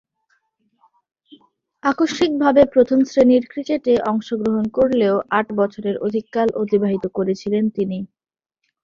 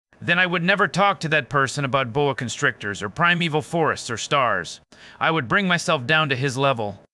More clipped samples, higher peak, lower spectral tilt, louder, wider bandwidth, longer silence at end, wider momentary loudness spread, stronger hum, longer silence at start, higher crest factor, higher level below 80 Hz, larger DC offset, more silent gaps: neither; about the same, -2 dBFS vs -2 dBFS; first, -6.5 dB/octave vs -4.5 dB/octave; first, -18 LUFS vs -21 LUFS; second, 7.6 kHz vs 12 kHz; first, 0.8 s vs 0.15 s; first, 9 LU vs 6 LU; neither; first, 1.85 s vs 0.2 s; about the same, 18 dB vs 20 dB; about the same, -54 dBFS vs -58 dBFS; neither; neither